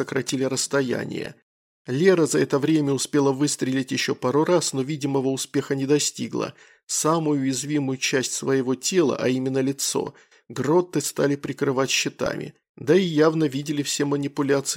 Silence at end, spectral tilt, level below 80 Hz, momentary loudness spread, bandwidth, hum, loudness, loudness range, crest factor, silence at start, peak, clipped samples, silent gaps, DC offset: 0 s; -4.5 dB/octave; -64 dBFS; 8 LU; 16.5 kHz; none; -23 LUFS; 2 LU; 18 dB; 0 s; -4 dBFS; under 0.1%; 1.42-1.85 s, 6.83-6.87 s, 12.69-12.75 s; under 0.1%